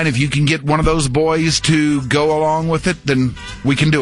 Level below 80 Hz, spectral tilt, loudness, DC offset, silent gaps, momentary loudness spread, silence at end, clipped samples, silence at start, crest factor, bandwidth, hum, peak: -32 dBFS; -5 dB/octave; -16 LUFS; under 0.1%; none; 4 LU; 0 s; under 0.1%; 0 s; 12 dB; 11.5 kHz; none; -2 dBFS